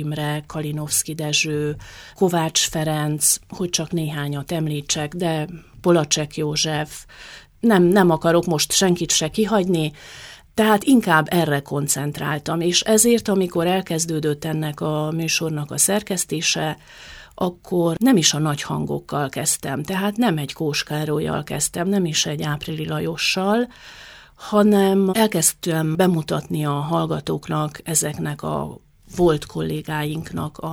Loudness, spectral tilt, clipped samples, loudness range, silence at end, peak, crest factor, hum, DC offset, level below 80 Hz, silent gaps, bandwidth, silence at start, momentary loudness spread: -20 LUFS; -4 dB/octave; under 0.1%; 4 LU; 0 s; -2 dBFS; 20 dB; none; under 0.1%; -50 dBFS; none; 19 kHz; 0 s; 11 LU